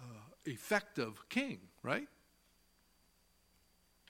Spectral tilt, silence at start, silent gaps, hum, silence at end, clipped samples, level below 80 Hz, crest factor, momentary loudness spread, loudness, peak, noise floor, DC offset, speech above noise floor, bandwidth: -4.5 dB/octave; 0 s; none; none; 2 s; under 0.1%; -76 dBFS; 26 dB; 12 LU; -40 LUFS; -16 dBFS; -73 dBFS; under 0.1%; 33 dB; 16.5 kHz